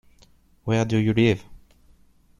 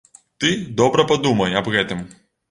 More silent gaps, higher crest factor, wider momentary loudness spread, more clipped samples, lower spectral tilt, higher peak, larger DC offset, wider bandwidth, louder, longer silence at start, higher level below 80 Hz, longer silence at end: neither; about the same, 20 dB vs 18 dB; about the same, 10 LU vs 9 LU; neither; first, -7 dB/octave vs -4.5 dB/octave; second, -6 dBFS vs -2 dBFS; neither; about the same, 10.5 kHz vs 11 kHz; second, -22 LUFS vs -19 LUFS; first, 0.65 s vs 0.4 s; about the same, -52 dBFS vs -52 dBFS; first, 0.85 s vs 0.45 s